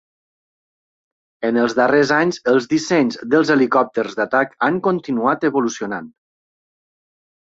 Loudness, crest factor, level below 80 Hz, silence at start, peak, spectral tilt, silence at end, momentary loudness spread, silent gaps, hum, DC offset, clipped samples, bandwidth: -18 LUFS; 16 dB; -64 dBFS; 1.4 s; -2 dBFS; -5 dB/octave; 1.35 s; 7 LU; none; none; under 0.1%; under 0.1%; 8 kHz